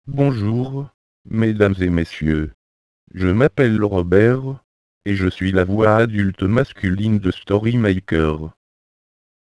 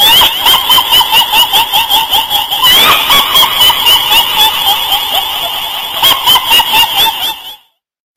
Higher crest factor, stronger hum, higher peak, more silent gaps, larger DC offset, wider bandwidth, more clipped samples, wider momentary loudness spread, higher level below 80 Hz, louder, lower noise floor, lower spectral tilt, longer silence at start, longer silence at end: first, 18 dB vs 8 dB; neither; about the same, 0 dBFS vs 0 dBFS; first, 0.94-1.25 s, 2.54-3.07 s, 4.64-5.01 s vs none; second, under 0.1% vs 0.5%; second, 11 kHz vs 17.5 kHz; second, under 0.1% vs 0.2%; first, 14 LU vs 8 LU; about the same, -38 dBFS vs -38 dBFS; second, -18 LUFS vs -6 LUFS; first, under -90 dBFS vs -41 dBFS; first, -8.5 dB/octave vs 0.5 dB/octave; about the same, 0.05 s vs 0 s; first, 1.05 s vs 0.6 s